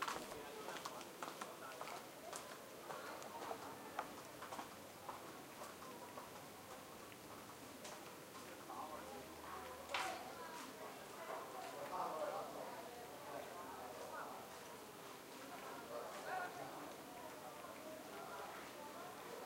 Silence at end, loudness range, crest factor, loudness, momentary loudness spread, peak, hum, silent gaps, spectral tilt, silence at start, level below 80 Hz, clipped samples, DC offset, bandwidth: 0 s; 5 LU; 26 dB; -51 LUFS; 8 LU; -26 dBFS; none; none; -2.5 dB/octave; 0 s; -80 dBFS; under 0.1%; under 0.1%; 16 kHz